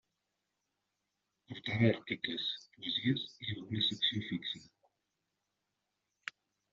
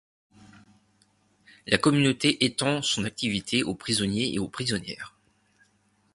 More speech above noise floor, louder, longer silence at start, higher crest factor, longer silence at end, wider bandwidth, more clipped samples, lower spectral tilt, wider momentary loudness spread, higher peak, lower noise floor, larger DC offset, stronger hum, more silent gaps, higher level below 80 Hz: first, 50 dB vs 41 dB; second, -35 LUFS vs -25 LUFS; second, 1.5 s vs 1.65 s; about the same, 22 dB vs 26 dB; second, 0.4 s vs 1.05 s; second, 7.6 kHz vs 11.5 kHz; neither; about the same, -3.5 dB/octave vs -4 dB/octave; first, 17 LU vs 12 LU; second, -16 dBFS vs -2 dBFS; first, -86 dBFS vs -67 dBFS; neither; first, 50 Hz at -65 dBFS vs none; neither; second, -74 dBFS vs -58 dBFS